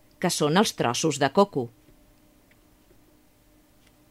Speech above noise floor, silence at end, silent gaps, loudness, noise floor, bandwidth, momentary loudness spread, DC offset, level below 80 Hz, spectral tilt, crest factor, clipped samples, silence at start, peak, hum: 36 dB; 2.45 s; none; -24 LUFS; -59 dBFS; 16 kHz; 8 LU; under 0.1%; -64 dBFS; -4 dB/octave; 22 dB; under 0.1%; 0.2 s; -6 dBFS; none